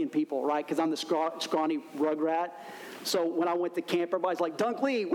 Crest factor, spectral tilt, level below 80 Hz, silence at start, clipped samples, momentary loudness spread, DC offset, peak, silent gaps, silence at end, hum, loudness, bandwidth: 14 dB; -4 dB/octave; -84 dBFS; 0 s; under 0.1%; 4 LU; under 0.1%; -16 dBFS; none; 0 s; none; -30 LUFS; 18 kHz